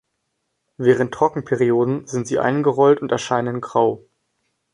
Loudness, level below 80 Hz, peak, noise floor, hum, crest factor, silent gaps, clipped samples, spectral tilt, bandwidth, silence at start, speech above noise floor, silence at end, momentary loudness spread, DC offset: -19 LUFS; -60 dBFS; -4 dBFS; -74 dBFS; none; 16 dB; none; under 0.1%; -6.5 dB/octave; 10.5 kHz; 0.8 s; 56 dB; 0.75 s; 6 LU; under 0.1%